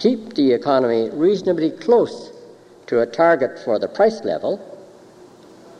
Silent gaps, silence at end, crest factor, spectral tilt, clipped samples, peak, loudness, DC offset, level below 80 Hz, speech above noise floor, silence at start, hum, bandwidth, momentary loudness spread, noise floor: none; 1 s; 16 dB; -6.5 dB/octave; under 0.1%; -4 dBFS; -19 LUFS; under 0.1%; -68 dBFS; 27 dB; 0 s; none; 9.4 kHz; 9 LU; -45 dBFS